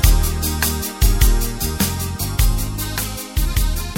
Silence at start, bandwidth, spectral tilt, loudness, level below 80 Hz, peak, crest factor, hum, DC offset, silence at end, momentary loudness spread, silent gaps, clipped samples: 0 s; 17 kHz; -4 dB/octave; -20 LUFS; -18 dBFS; 0 dBFS; 16 dB; none; under 0.1%; 0 s; 6 LU; none; under 0.1%